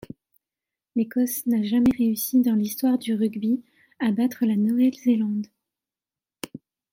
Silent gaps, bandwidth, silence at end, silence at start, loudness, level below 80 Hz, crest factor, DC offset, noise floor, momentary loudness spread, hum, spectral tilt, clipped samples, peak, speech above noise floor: none; 16.5 kHz; 0.35 s; 0.95 s; -23 LUFS; -60 dBFS; 14 dB; under 0.1%; under -90 dBFS; 10 LU; none; -5.5 dB/octave; under 0.1%; -10 dBFS; over 68 dB